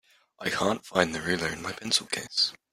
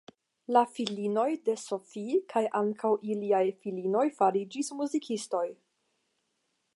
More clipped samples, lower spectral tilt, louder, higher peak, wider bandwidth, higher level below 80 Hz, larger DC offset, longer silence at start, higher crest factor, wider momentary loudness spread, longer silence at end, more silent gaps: neither; second, -2.5 dB/octave vs -5 dB/octave; about the same, -28 LUFS vs -30 LUFS; first, -4 dBFS vs -10 dBFS; first, 16 kHz vs 11.5 kHz; first, -62 dBFS vs -86 dBFS; neither; about the same, 0.4 s vs 0.5 s; first, 26 dB vs 20 dB; about the same, 6 LU vs 8 LU; second, 0.15 s vs 1.2 s; neither